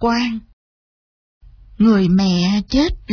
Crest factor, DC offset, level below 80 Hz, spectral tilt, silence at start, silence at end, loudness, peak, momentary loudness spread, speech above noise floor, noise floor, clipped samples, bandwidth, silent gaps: 14 dB; under 0.1%; -36 dBFS; -6.5 dB/octave; 0 s; 0 s; -16 LUFS; -4 dBFS; 7 LU; over 75 dB; under -90 dBFS; under 0.1%; 5.4 kHz; 0.53-1.41 s